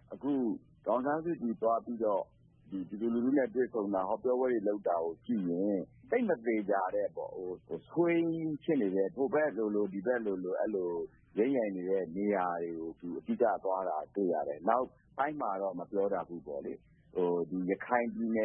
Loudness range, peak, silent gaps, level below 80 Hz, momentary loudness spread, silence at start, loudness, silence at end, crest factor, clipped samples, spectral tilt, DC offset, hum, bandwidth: 2 LU; -14 dBFS; none; -72 dBFS; 10 LU; 0.1 s; -34 LUFS; 0 s; 20 dB; under 0.1%; -11 dB/octave; under 0.1%; none; 3.6 kHz